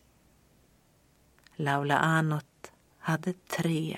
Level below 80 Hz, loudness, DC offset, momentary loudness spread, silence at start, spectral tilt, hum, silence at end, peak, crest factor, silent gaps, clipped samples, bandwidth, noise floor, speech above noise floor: -68 dBFS; -29 LUFS; under 0.1%; 13 LU; 1.6 s; -6 dB/octave; none; 0 s; -8 dBFS; 24 dB; none; under 0.1%; 16 kHz; -65 dBFS; 36 dB